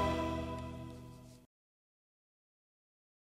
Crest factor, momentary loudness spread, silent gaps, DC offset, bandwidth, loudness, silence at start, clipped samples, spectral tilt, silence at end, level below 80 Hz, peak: 20 dB; 20 LU; none; under 0.1%; 16 kHz; -40 LUFS; 0 s; under 0.1%; -6.5 dB/octave; 1.75 s; -54 dBFS; -22 dBFS